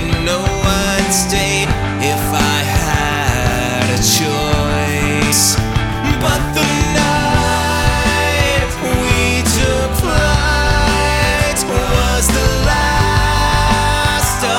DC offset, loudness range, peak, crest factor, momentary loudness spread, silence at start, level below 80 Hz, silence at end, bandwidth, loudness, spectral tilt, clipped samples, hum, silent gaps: under 0.1%; 1 LU; 0 dBFS; 12 dB; 3 LU; 0 s; -22 dBFS; 0 s; 18 kHz; -14 LUFS; -4 dB/octave; under 0.1%; none; none